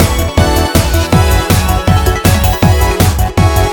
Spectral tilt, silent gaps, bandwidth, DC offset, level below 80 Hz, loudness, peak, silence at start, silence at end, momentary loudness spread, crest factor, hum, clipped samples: -5 dB/octave; none; over 20 kHz; under 0.1%; -16 dBFS; -11 LUFS; 0 dBFS; 0 s; 0 s; 1 LU; 10 dB; none; 1%